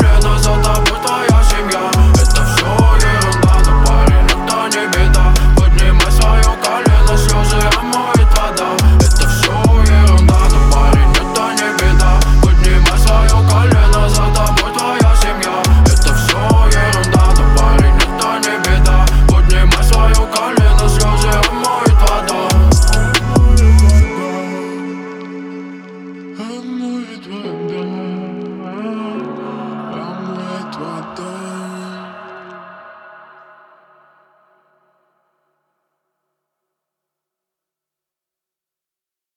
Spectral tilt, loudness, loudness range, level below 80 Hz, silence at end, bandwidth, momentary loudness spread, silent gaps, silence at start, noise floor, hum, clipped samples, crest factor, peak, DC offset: -5 dB/octave; -12 LUFS; 14 LU; -12 dBFS; 6.75 s; 16 kHz; 16 LU; none; 0 s; -87 dBFS; none; under 0.1%; 10 dB; 0 dBFS; under 0.1%